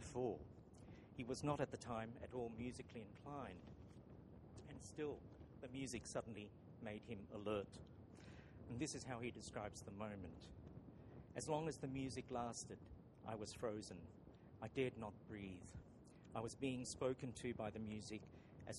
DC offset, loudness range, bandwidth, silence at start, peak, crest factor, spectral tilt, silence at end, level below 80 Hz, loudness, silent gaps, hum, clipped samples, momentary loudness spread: under 0.1%; 4 LU; 11.5 kHz; 0 s; -28 dBFS; 22 dB; -5 dB/octave; 0 s; -68 dBFS; -50 LUFS; none; none; under 0.1%; 16 LU